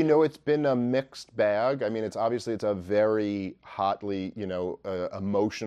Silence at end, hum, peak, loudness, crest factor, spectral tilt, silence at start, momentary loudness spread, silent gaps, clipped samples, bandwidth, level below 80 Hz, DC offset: 0 s; none; -10 dBFS; -28 LUFS; 16 dB; -6.5 dB/octave; 0 s; 8 LU; none; under 0.1%; 11.5 kHz; -68 dBFS; under 0.1%